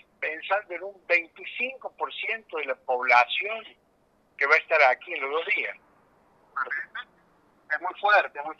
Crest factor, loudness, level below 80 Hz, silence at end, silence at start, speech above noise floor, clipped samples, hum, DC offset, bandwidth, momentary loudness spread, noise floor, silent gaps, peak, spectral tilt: 24 dB; -25 LUFS; -78 dBFS; 0.05 s; 0.2 s; 39 dB; under 0.1%; 50 Hz at -80 dBFS; under 0.1%; 7.4 kHz; 15 LU; -65 dBFS; none; -4 dBFS; -1.5 dB/octave